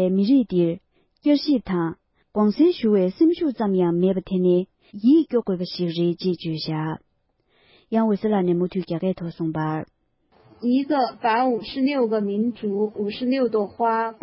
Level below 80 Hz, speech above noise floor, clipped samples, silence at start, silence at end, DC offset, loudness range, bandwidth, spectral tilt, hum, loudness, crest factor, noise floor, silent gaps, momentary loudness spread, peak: -58 dBFS; 47 dB; under 0.1%; 0 s; 0.1 s; under 0.1%; 4 LU; 5.8 kHz; -11.5 dB/octave; none; -22 LUFS; 14 dB; -68 dBFS; none; 9 LU; -8 dBFS